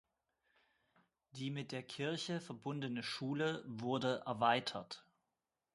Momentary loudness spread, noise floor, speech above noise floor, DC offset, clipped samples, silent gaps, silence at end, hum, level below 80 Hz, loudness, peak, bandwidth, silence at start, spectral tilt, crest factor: 12 LU; -90 dBFS; 50 dB; under 0.1%; under 0.1%; none; 0.75 s; none; -82 dBFS; -40 LUFS; -18 dBFS; 11.5 kHz; 1.35 s; -5 dB/octave; 24 dB